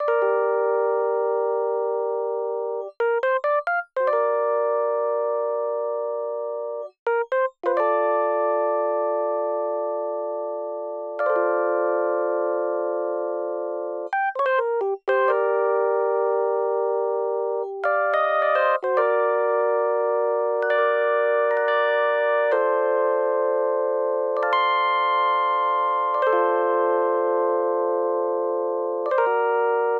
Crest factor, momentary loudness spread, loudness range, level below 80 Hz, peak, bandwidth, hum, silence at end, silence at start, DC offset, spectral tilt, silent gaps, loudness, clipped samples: 14 dB; 6 LU; 4 LU; -78 dBFS; -8 dBFS; 5 kHz; none; 0 s; 0 s; under 0.1%; -4.5 dB/octave; 6.99-7.06 s; -23 LUFS; under 0.1%